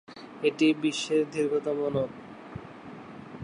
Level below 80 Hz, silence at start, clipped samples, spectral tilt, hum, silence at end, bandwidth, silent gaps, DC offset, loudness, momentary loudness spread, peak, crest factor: -64 dBFS; 0.1 s; under 0.1%; -5 dB/octave; none; 0 s; 11 kHz; none; under 0.1%; -27 LUFS; 20 LU; -12 dBFS; 16 dB